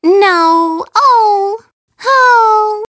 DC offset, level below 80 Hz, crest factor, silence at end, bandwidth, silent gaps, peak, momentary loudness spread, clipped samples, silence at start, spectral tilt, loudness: under 0.1%; -64 dBFS; 10 dB; 0.05 s; 8 kHz; 1.73-1.88 s; 0 dBFS; 11 LU; under 0.1%; 0.05 s; -2 dB/octave; -9 LUFS